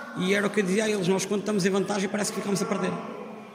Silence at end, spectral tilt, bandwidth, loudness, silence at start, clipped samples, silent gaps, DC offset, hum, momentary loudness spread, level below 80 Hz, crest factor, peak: 0 s; -4.5 dB/octave; 16 kHz; -26 LUFS; 0 s; under 0.1%; none; under 0.1%; none; 6 LU; -72 dBFS; 16 dB; -10 dBFS